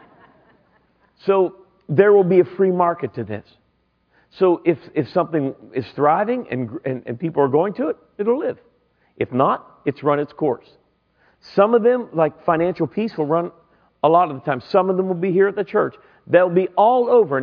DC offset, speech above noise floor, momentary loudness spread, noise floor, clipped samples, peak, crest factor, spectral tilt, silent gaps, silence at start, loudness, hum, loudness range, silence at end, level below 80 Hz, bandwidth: under 0.1%; 46 dB; 12 LU; -65 dBFS; under 0.1%; 0 dBFS; 20 dB; -10 dB/octave; none; 1.25 s; -19 LUFS; none; 4 LU; 0 s; -64 dBFS; 5.4 kHz